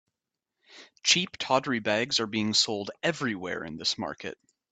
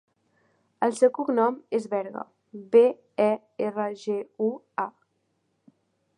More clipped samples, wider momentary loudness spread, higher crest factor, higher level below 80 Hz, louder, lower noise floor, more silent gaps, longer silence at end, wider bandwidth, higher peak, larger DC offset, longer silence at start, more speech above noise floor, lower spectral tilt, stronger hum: neither; second, 11 LU vs 14 LU; about the same, 22 dB vs 20 dB; first, -70 dBFS vs -84 dBFS; about the same, -27 LUFS vs -26 LUFS; first, -87 dBFS vs -74 dBFS; neither; second, 0.35 s vs 1.3 s; second, 9 kHz vs 10.5 kHz; about the same, -8 dBFS vs -6 dBFS; neither; about the same, 0.7 s vs 0.8 s; first, 58 dB vs 49 dB; second, -2.5 dB/octave vs -6 dB/octave; neither